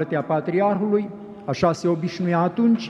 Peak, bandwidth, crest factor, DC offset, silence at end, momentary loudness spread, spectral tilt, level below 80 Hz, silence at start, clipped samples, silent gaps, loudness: -4 dBFS; 9 kHz; 16 dB; under 0.1%; 0 s; 8 LU; -7.5 dB/octave; -58 dBFS; 0 s; under 0.1%; none; -22 LUFS